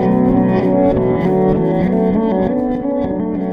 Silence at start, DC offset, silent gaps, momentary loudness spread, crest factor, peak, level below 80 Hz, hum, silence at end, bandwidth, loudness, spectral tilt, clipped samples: 0 s; under 0.1%; none; 5 LU; 12 dB; -2 dBFS; -34 dBFS; none; 0 s; 5.4 kHz; -15 LUFS; -10.5 dB/octave; under 0.1%